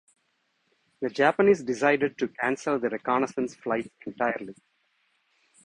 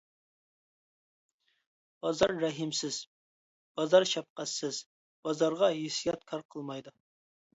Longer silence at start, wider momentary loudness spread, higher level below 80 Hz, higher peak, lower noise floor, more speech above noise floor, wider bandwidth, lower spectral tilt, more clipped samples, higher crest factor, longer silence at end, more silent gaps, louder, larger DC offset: second, 1 s vs 2.05 s; second, 11 LU vs 15 LU; about the same, -68 dBFS vs -70 dBFS; first, -6 dBFS vs -10 dBFS; second, -73 dBFS vs under -90 dBFS; second, 47 dB vs over 59 dB; first, 10 kHz vs 8 kHz; first, -5.5 dB/octave vs -3.5 dB/octave; neither; about the same, 22 dB vs 24 dB; first, 1.15 s vs 0.65 s; second, none vs 3.07-3.75 s, 4.30-4.36 s, 4.86-5.23 s, 6.45-6.49 s; first, -26 LUFS vs -31 LUFS; neither